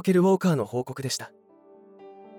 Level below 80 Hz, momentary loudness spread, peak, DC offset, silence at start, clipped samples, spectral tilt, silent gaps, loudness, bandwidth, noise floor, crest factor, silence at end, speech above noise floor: -74 dBFS; 11 LU; -10 dBFS; under 0.1%; 0.05 s; under 0.1%; -6 dB/octave; none; -25 LUFS; 17 kHz; -53 dBFS; 16 dB; 0 s; 29 dB